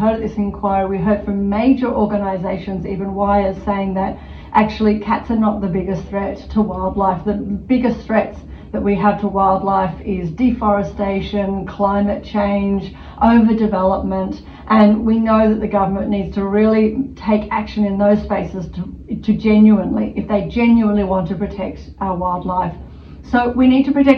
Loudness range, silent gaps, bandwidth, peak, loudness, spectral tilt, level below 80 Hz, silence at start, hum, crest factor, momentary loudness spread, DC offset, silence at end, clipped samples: 3 LU; none; 6.2 kHz; 0 dBFS; -17 LUFS; -9 dB/octave; -36 dBFS; 0 s; none; 16 dB; 10 LU; under 0.1%; 0 s; under 0.1%